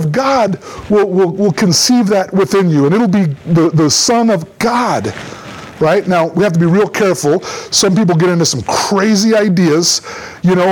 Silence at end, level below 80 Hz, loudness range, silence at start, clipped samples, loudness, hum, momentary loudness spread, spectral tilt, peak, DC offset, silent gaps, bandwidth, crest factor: 0 s; -48 dBFS; 2 LU; 0 s; under 0.1%; -12 LUFS; none; 7 LU; -4.5 dB/octave; -2 dBFS; under 0.1%; none; 19 kHz; 10 dB